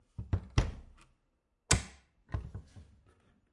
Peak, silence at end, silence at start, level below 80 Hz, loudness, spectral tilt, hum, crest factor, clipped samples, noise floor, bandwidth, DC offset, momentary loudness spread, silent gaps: -6 dBFS; 0.7 s; 0.2 s; -44 dBFS; -35 LUFS; -3.5 dB/octave; none; 32 dB; under 0.1%; -78 dBFS; 11.5 kHz; under 0.1%; 20 LU; none